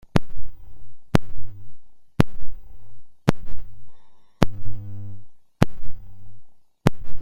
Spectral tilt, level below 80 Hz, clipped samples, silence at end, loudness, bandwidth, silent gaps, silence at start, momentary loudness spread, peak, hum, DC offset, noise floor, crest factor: -7 dB/octave; -36 dBFS; under 0.1%; 0 s; -26 LUFS; 16 kHz; none; 0.15 s; 22 LU; 0 dBFS; none; under 0.1%; -39 dBFS; 18 dB